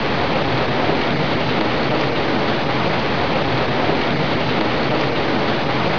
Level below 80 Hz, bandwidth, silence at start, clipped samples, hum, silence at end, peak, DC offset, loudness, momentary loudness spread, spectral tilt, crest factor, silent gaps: -40 dBFS; 5.4 kHz; 0 s; under 0.1%; none; 0 s; -4 dBFS; 5%; -19 LUFS; 1 LU; -6.5 dB/octave; 14 dB; none